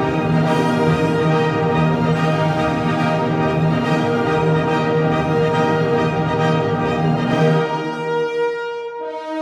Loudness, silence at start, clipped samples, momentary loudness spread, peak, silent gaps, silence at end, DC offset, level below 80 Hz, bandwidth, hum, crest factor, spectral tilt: -18 LUFS; 0 s; under 0.1%; 5 LU; -4 dBFS; none; 0 s; under 0.1%; -44 dBFS; 10 kHz; none; 12 dB; -7.5 dB/octave